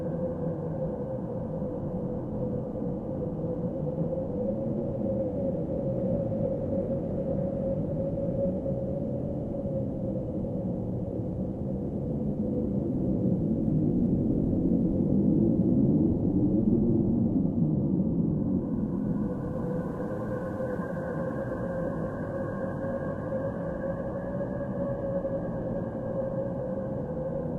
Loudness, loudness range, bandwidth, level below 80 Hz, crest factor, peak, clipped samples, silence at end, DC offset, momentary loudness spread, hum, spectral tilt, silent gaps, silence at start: -30 LUFS; 7 LU; 3.2 kHz; -46 dBFS; 16 dB; -14 dBFS; under 0.1%; 0 s; under 0.1%; 8 LU; none; -12 dB/octave; none; 0 s